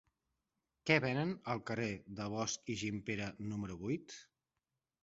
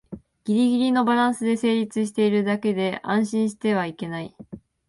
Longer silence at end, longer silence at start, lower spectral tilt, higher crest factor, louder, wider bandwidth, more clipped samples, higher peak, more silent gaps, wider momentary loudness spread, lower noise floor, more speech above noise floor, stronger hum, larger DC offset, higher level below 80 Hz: first, 0.8 s vs 0.3 s; first, 0.85 s vs 0.1 s; second, -4.5 dB/octave vs -6 dB/octave; first, 26 dB vs 14 dB; second, -39 LUFS vs -23 LUFS; second, 8 kHz vs 11.5 kHz; neither; second, -14 dBFS vs -8 dBFS; neither; second, 11 LU vs 15 LU; first, under -90 dBFS vs -43 dBFS; first, over 51 dB vs 21 dB; neither; neither; second, -68 dBFS vs -62 dBFS